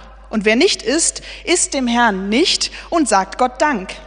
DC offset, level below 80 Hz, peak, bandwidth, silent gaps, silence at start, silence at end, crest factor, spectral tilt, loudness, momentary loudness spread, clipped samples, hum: under 0.1%; -42 dBFS; 0 dBFS; 10 kHz; none; 0 s; 0 s; 16 dB; -2 dB/octave; -16 LUFS; 5 LU; under 0.1%; none